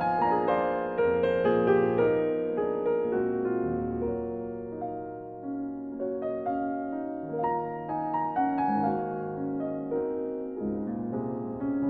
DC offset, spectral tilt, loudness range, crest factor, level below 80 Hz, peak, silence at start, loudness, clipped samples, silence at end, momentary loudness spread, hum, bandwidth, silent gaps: under 0.1%; -10 dB/octave; 7 LU; 16 dB; -58 dBFS; -12 dBFS; 0 s; -29 LUFS; under 0.1%; 0 s; 10 LU; none; 4.6 kHz; none